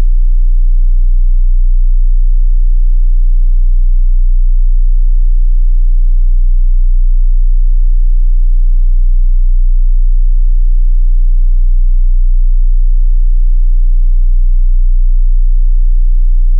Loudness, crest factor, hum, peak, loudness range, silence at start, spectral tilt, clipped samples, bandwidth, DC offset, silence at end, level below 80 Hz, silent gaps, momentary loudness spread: -15 LUFS; 4 dB; none; -2 dBFS; 0 LU; 0 s; -16 dB/octave; under 0.1%; 0.2 kHz; under 0.1%; 0 s; -6 dBFS; none; 0 LU